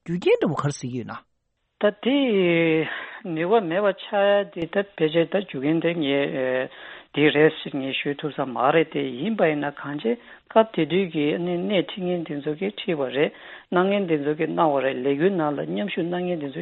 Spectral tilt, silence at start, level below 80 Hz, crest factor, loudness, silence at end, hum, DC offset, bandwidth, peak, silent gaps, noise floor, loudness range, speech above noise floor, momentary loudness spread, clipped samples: -6.5 dB/octave; 0.05 s; -66 dBFS; 20 dB; -23 LUFS; 0 s; none; under 0.1%; 8.2 kHz; -4 dBFS; none; -74 dBFS; 2 LU; 51 dB; 8 LU; under 0.1%